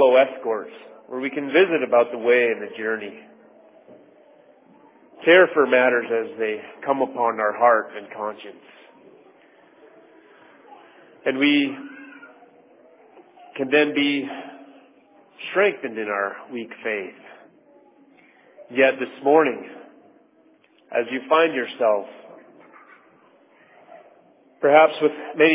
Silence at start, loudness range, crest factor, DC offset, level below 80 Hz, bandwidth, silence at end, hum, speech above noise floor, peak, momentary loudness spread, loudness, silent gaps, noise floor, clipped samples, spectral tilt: 0 s; 7 LU; 22 dB; under 0.1%; -86 dBFS; 3.9 kHz; 0 s; none; 37 dB; -2 dBFS; 19 LU; -21 LUFS; none; -57 dBFS; under 0.1%; -8 dB/octave